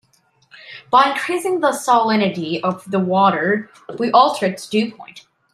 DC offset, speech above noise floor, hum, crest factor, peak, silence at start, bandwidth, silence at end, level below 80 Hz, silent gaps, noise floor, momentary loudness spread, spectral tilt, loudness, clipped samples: under 0.1%; 42 dB; none; 18 dB; 0 dBFS; 0.55 s; 14.5 kHz; 0.35 s; -68 dBFS; none; -59 dBFS; 10 LU; -5 dB/octave; -17 LUFS; under 0.1%